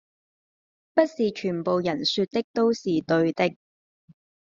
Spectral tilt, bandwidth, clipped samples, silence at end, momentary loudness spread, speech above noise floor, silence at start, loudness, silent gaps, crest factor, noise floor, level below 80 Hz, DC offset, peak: -4 dB/octave; 7.6 kHz; under 0.1%; 1.05 s; 4 LU; over 66 dB; 0.95 s; -25 LUFS; 2.44-2.54 s; 20 dB; under -90 dBFS; -68 dBFS; under 0.1%; -6 dBFS